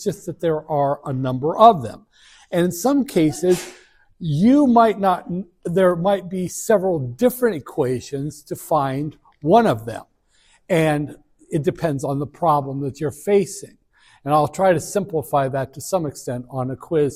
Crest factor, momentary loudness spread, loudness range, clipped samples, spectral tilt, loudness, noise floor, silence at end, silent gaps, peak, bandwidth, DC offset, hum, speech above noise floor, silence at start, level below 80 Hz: 20 dB; 13 LU; 4 LU; under 0.1%; -6.5 dB/octave; -20 LUFS; -58 dBFS; 0 s; none; 0 dBFS; 16 kHz; under 0.1%; none; 39 dB; 0 s; -54 dBFS